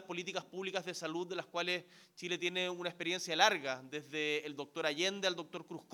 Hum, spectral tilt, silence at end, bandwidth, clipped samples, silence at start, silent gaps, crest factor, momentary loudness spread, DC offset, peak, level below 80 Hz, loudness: none; -2.5 dB/octave; 0 s; 18.5 kHz; under 0.1%; 0 s; none; 26 dB; 13 LU; under 0.1%; -12 dBFS; under -90 dBFS; -37 LUFS